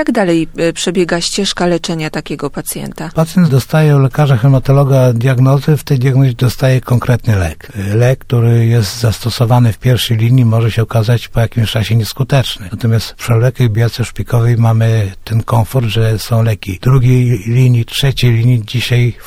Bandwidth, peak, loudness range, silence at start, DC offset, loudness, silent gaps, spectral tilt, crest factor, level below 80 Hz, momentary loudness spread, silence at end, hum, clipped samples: 15.5 kHz; 0 dBFS; 3 LU; 0 s; under 0.1%; -12 LUFS; none; -6.5 dB/octave; 12 dB; -32 dBFS; 7 LU; 0.05 s; none; under 0.1%